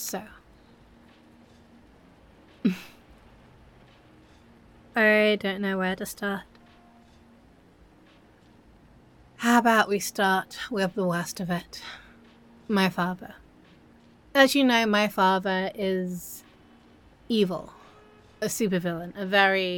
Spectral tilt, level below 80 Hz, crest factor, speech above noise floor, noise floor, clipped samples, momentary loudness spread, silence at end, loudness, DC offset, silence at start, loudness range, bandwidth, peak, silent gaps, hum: -4.5 dB/octave; -62 dBFS; 24 dB; 31 dB; -56 dBFS; under 0.1%; 18 LU; 0 s; -25 LUFS; under 0.1%; 0 s; 13 LU; 17.5 kHz; -4 dBFS; none; none